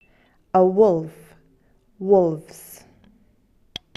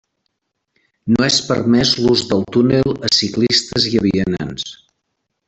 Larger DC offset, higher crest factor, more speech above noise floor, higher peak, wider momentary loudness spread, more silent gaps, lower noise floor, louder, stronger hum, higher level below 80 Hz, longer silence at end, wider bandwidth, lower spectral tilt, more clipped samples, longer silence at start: neither; about the same, 18 dB vs 16 dB; second, 41 dB vs 58 dB; about the same, -4 dBFS vs -2 dBFS; first, 24 LU vs 10 LU; neither; second, -59 dBFS vs -73 dBFS; second, -19 LUFS vs -15 LUFS; neither; second, -60 dBFS vs -46 dBFS; first, 1.25 s vs 0.75 s; first, 13 kHz vs 8.2 kHz; first, -7.5 dB/octave vs -4.5 dB/octave; neither; second, 0.55 s vs 1.05 s